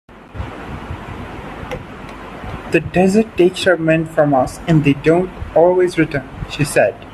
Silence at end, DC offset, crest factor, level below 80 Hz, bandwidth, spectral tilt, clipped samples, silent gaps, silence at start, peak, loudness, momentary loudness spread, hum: 0 s; under 0.1%; 16 dB; -38 dBFS; 13.5 kHz; -6.5 dB/octave; under 0.1%; none; 0.1 s; 0 dBFS; -15 LUFS; 17 LU; none